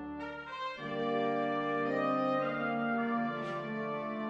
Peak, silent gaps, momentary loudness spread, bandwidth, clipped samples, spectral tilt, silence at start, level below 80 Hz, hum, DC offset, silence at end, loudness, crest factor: -20 dBFS; none; 9 LU; 8 kHz; under 0.1%; -7 dB/octave; 0 s; -70 dBFS; none; under 0.1%; 0 s; -34 LUFS; 14 dB